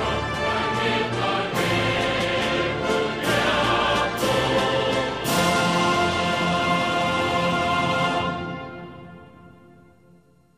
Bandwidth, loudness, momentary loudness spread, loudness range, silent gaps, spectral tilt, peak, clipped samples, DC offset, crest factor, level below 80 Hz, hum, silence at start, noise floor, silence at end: 15 kHz; -22 LUFS; 5 LU; 3 LU; none; -4.5 dB/octave; -8 dBFS; under 0.1%; 0.1%; 14 dB; -46 dBFS; none; 0 s; -55 dBFS; 1.1 s